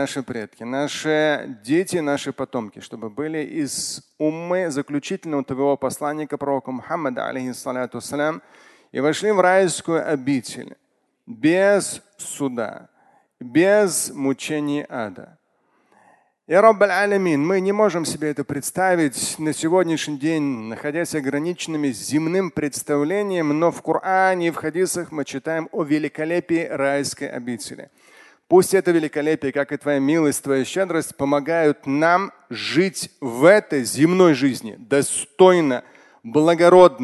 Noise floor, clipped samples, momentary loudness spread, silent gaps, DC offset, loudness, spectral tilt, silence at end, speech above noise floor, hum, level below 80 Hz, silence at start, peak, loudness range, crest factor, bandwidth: -65 dBFS; under 0.1%; 13 LU; none; under 0.1%; -20 LUFS; -4.5 dB/octave; 0 s; 45 dB; none; -64 dBFS; 0 s; 0 dBFS; 6 LU; 20 dB; 12.5 kHz